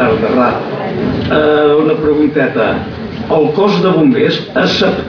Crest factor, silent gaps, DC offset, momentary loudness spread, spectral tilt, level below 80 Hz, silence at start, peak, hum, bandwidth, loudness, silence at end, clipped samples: 10 dB; none; under 0.1%; 8 LU; -7 dB/octave; -40 dBFS; 0 s; 0 dBFS; none; 5.4 kHz; -12 LUFS; 0 s; under 0.1%